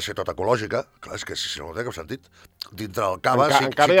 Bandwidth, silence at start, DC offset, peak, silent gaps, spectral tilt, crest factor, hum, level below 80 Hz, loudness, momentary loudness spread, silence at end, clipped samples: 17.5 kHz; 0 s; under 0.1%; 0 dBFS; none; -4 dB/octave; 22 dB; none; -56 dBFS; -23 LUFS; 18 LU; 0 s; under 0.1%